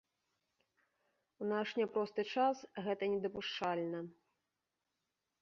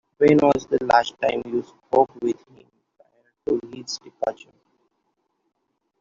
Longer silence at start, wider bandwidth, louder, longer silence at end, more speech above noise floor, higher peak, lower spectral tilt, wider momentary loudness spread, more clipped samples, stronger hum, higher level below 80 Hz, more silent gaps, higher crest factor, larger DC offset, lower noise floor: first, 1.4 s vs 0.2 s; about the same, 7.2 kHz vs 7.6 kHz; second, -38 LUFS vs -22 LUFS; second, 1.3 s vs 1.65 s; about the same, 51 dB vs 52 dB; second, -22 dBFS vs -2 dBFS; second, -3 dB/octave vs -5.5 dB/octave; second, 8 LU vs 15 LU; neither; neither; second, -80 dBFS vs -58 dBFS; neither; about the same, 20 dB vs 22 dB; neither; first, -89 dBFS vs -73 dBFS